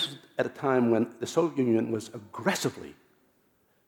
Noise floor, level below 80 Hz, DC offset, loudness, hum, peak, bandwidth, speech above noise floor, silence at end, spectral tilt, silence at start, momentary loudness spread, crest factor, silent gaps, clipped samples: -68 dBFS; -74 dBFS; under 0.1%; -28 LUFS; none; -10 dBFS; 18.5 kHz; 40 dB; 0.95 s; -5 dB/octave; 0 s; 11 LU; 20 dB; none; under 0.1%